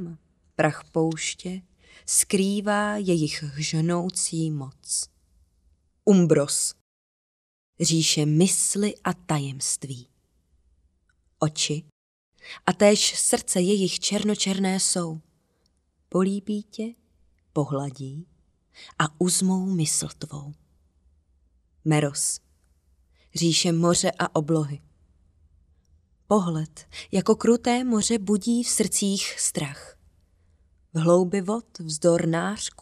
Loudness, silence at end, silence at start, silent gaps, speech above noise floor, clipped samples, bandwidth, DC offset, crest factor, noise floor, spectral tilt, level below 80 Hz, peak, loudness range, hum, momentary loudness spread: -24 LUFS; 0.15 s; 0 s; 6.81-7.73 s, 11.92-12.32 s; 45 dB; under 0.1%; 15 kHz; under 0.1%; 24 dB; -69 dBFS; -4 dB/octave; -60 dBFS; -2 dBFS; 6 LU; none; 15 LU